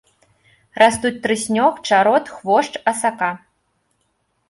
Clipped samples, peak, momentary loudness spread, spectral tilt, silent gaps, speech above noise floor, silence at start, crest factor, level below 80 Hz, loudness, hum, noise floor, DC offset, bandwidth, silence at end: under 0.1%; -2 dBFS; 9 LU; -3.5 dB/octave; none; 50 dB; 0.75 s; 18 dB; -58 dBFS; -17 LUFS; none; -68 dBFS; under 0.1%; 11.5 kHz; 1.15 s